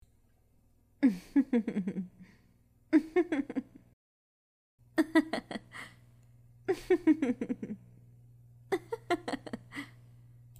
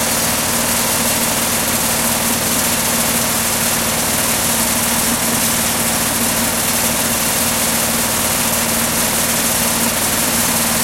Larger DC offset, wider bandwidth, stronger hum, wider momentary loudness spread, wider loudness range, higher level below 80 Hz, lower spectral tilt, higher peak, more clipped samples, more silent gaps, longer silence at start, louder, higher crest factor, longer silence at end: neither; second, 15 kHz vs 17 kHz; first, 60 Hz at -65 dBFS vs none; first, 17 LU vs 1 LU; first, 4 LU vs 0 LU; second, -66 dBFS vs -38 dBFS; first, -6.5 dB/octave vs -1.5 dB/octave; second, -12 dBFS vs -2 dBFS; neither; first, 3.93-4.78 s vs none; first, 1 s vs 0 s; second, -32 LUFS vs -14 LUFS; first, 22 dB vs 14 dB; first, 0.75 s vs 0 s